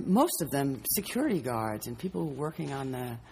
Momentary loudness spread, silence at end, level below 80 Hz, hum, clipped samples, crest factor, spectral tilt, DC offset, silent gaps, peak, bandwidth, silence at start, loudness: 9 LU; 0 s; -58 dBFS; none; under 0.1%; 20 dB; -5 dB/octave; under 0.1%; none; -12 dBFS; 15.5 kHz; 0 s; -31 LUFS